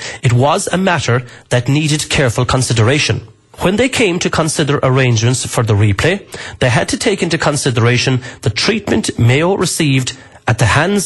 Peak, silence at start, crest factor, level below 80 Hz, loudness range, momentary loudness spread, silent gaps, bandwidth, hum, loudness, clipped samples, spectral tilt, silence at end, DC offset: -2 dBFS; 0 s; 12 dB; -38 dBFS; 1 LU; 5 LU; none; 12 kHz; none; -14 LUFS; under 0.1%; -4.5 dB/octave; 0 s; under 0.1%